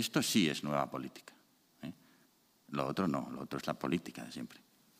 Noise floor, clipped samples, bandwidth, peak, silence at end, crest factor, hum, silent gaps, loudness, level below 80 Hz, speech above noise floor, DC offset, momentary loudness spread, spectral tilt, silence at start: -70 dBFS; under 0.1%; 15.5 kHz; -16 dBFS; 0.4 s; 22 dB; none; none; -36 LUFS; -72 dBFS; 34 dB; under 0.1%; 19 LU; -4.5 dB/octave; 0 s